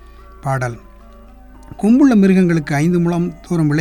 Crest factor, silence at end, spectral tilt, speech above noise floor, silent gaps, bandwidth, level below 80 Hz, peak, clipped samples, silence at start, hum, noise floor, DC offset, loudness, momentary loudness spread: 14 dB; 0 s; -8 dB/octave; 26 dB; none; 12.5 kHz; -40 dBFS; -2 dBFS; under 0.1%; 0.45 s; none; -40 dBFS; under 0.1%; -15 LUFS; 13 LU